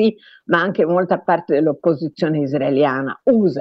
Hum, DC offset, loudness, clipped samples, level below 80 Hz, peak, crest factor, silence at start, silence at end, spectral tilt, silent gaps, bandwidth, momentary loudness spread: none; under 0.1%; -18 LUFS; under 0.1%; -62 dBFS; -2 dBFS; 16 dB; 0 s; 0 s; -8.5 dB/octave; none; 6.2 kHz; 4 LU